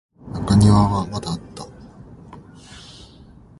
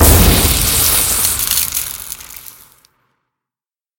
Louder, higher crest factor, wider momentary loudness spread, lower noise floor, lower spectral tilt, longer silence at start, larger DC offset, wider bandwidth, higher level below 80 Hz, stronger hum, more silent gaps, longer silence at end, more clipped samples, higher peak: second, -18 LUFS vs -11 LUFS; about the same, 20 dB vs 16 dB; first, 27 LU vs 18 LU; second, -45 dBFS vs under -90 dBFS; first, -7 dB/octave vs -3 dB/octave; first, 0.25 s vs 0 s; neither; second, 11.5 kHz vs 18 kHz; second, -36 dBFS vs -22 dBFS; neither; neither; second, 0.8 s vs 1.6 s; neither; about the same, -2 dBFS vs 0 dBFS